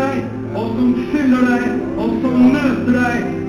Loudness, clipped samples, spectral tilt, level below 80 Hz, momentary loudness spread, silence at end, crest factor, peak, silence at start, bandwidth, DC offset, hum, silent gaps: -16 LUFS; under 0.1%; -7 dB/octave; -42 dBFS; 9 LU; 0 s; 12 dB; -4 dBFS; 0 s; 10.5 kHz; under 0.1%; none; none